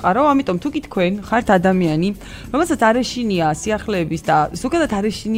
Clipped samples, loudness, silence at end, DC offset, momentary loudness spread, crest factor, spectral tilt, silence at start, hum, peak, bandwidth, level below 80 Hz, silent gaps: under 0.1%; -18 LUFS; 0 s; under 0.1%; 7 LU; 18 dB; -5.5 dB/octave; 0 s; none; 0 dBFS; 16 kHz; -40 dBFS; none